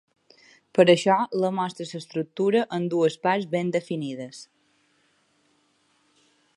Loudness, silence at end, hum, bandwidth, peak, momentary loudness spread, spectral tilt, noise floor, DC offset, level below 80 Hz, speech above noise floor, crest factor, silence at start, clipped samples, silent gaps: -24 LUFS; 2.15 s; none; 11.5 kHz; -4 dBFS; 16 LU; -5.5 dB/octave; -66 dBFS; under 0.1%; -76 dBFS; 43 dB; 22 dB; 0.75 s; under 0.1%; none